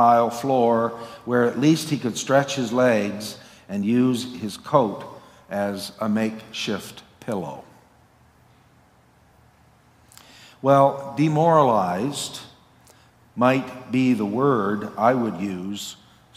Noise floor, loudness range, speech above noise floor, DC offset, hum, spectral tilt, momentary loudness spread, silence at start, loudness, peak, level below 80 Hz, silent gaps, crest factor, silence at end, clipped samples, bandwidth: -56 dBFS; 9 LU; 35 dB; under 0.1%; none; -5.5 dB/octave; 15 LU; 0 s; -22 LUFS; -2 dBFS; -66 dBFS; none; 20 dB; 0.4 s; under 0.1%; 16 kHz